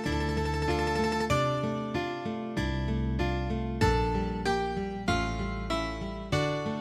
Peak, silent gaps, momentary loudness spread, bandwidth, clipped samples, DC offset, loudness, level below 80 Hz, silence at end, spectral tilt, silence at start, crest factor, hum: -12 dBFS; none; 5 LU; 14 kHz; under 0.1%; under 0.1%; -30 LUFS; -38 dBFS; 0 s; -6 dB/octave; 0 s; 16 dB; none